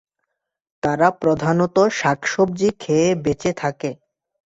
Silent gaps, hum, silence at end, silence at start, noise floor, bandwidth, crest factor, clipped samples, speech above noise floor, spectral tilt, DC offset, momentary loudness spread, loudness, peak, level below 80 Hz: none; none; 0.6 s; 0.85 s; -77 dBFS; 8 kHz; 18 dB; under 0.1%; 59 dB; -5.5 dB/octave; under 0.1%; 8 LU; -19 LUFS; -2 dBFS; -52 dBFS